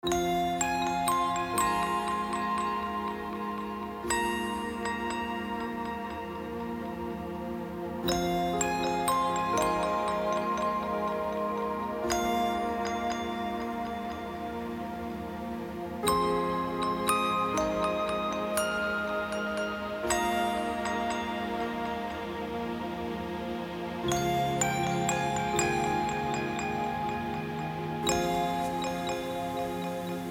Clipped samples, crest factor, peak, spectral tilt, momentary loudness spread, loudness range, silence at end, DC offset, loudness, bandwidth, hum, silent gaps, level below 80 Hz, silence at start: under 0.1%; 20 dB; -12 dBFS; -4 dB/octave; 9 LU; 4 LU; 0 s; under 0.1%; -31 LUFS; 17.5 kHz; none; none; -52 dBFS; 0.05 s